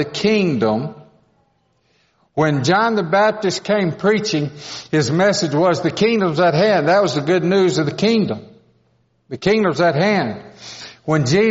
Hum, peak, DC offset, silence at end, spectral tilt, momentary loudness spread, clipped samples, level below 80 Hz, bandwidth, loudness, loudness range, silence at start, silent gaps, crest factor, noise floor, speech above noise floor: none; -2 dBFS; under 0.1%; 0 s; -4.5 dB/octave; 12 LU; under 0.1%; -56 dBFS; 8 kHz; -17 LUFS; 4 LU; 0 s; none; 16 dB; -62 dBFS; 46 dB